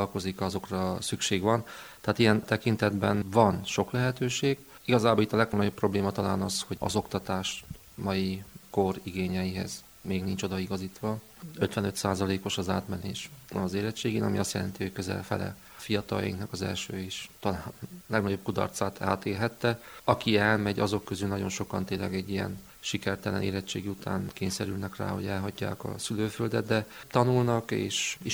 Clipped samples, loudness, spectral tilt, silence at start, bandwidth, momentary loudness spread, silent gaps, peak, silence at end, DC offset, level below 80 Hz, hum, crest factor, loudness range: under 0.1%; -30 LUFS; -5 dB/octave; 0 s; over 20 kHz; 10 LU; none; -6 dBFS; 0 s; under 0.1%; -58 dBFS; none; 24 dB; 6 LU